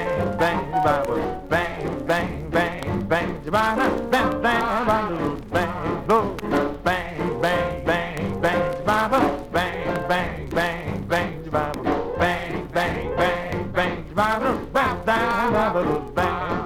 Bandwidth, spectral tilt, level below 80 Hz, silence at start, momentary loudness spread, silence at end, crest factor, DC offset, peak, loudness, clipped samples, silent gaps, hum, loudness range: 18.5 kHz; -6 dB/octave; -42 dBFS; 0 s; 5 LU; 0 s; 18 dB; under 0.1%; -4 dBFS; -23 LUFS; under 0.1%; none; none; 2 LU